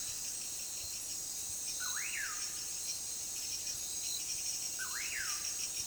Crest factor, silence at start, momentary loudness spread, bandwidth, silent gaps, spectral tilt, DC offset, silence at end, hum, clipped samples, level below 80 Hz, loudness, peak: 16 dB; 0 s; 3 LU; over 20 kHz; none; 1.5 dB/octave; under 0.1%; 0 s; none; under 0.1%; -66 dBFS; -37 LUFS; -24 dBFS